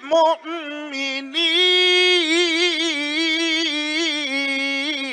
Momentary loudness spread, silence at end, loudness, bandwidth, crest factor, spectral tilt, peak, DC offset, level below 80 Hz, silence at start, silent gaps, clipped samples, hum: 11 LU; 0 s; -18 LUFS; 10 kHz; 12 dB; 0.5 dB/octave; -6 dBFS; under 0.1%; -78 dBFS; 0 s; none; under 0.1%; none